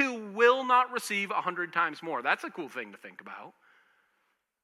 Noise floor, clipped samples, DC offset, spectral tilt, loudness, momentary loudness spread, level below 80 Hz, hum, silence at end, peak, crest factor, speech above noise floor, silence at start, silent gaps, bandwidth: -76 dBFS; under 0.1%; under 0.1%; -3 dB/octave; -28 LUFS; 21 LU; under -90 dBFS; none; 1.15 s; -10 dBFS; 22 dB; 43 dB; 0 s; none; 14.5 kHz